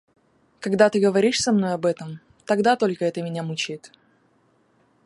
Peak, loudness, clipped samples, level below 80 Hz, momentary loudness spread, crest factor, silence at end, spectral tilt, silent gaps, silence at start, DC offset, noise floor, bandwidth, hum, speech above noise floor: -4 dBFS; -22 LUFS; under 0.1%; -66 dBFS; 15 LU; 20 dB; 1.2 s; -5 dB/octave; none; 0.6 s; under 0.1%; -63 dBFS; 11.5 kHz; none; 41 dB